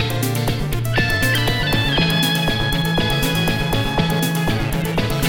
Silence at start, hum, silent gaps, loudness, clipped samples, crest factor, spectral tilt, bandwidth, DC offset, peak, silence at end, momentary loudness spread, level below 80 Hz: 0 s; none; none; -18 LUFS; under 0.1%; 14 dB; -4.5 dB/octave; 17.5 kHz; under 0.1%; -4 dBFS; 0 s; 4 LU; -30 dBFS